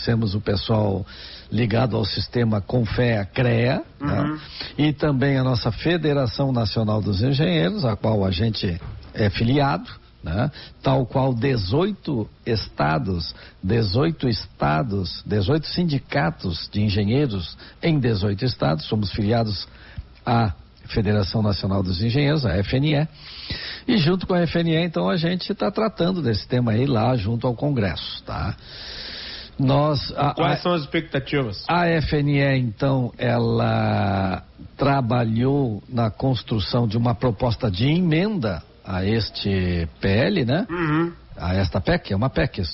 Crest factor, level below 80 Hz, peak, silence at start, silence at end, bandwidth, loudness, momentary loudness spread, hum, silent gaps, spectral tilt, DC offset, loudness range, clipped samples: 14 dB; -40 dBFS; -8 dBFS; 0 s; 0 s; 6 kHz; -22 LUFS; 9 LU; none; none; -5.5 dB/octave; under 0.1%; 2 LU; under 0.1%